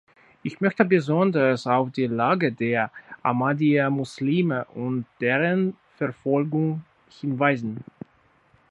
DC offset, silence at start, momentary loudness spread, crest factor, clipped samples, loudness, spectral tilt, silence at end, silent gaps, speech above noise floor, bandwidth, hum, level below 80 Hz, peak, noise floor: under 0.1%; 0.45 s; 10 LU; 22 dB; under 0.1%; -24 LUFS; -8 dB/octave; 0.9 s; none; 38 dB; 11 kHz; none; -68 dBFS; -2 dBFS; -61 dBFS